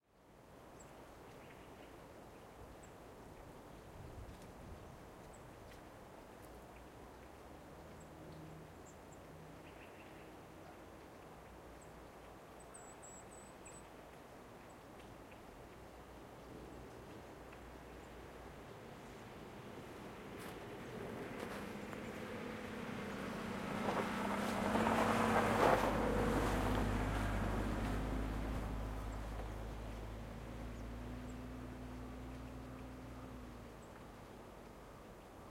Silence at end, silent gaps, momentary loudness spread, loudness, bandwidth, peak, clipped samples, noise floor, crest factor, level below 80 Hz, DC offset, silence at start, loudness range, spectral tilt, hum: 0 s; none; 20 LU; -42 LUFS; 16.5 kHz; -18 dBFS; under 0.1%; -64 dBFS; 26 dB; -52 dBFS; under 0.1%; 0.15 s; 20 LU; -5.5 dB/octave; none